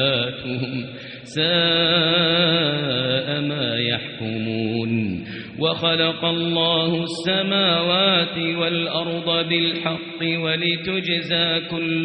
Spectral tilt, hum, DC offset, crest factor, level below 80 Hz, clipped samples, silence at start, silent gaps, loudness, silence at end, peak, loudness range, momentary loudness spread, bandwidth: -2.5 dB/octave; none; under 0.1%; 16 dB; -58 dBFS; under 0.1%; 0 s; none; -20 LUFS; 0 s; -6 dBFS; 3 LU; 10 LU; 5.8 kHz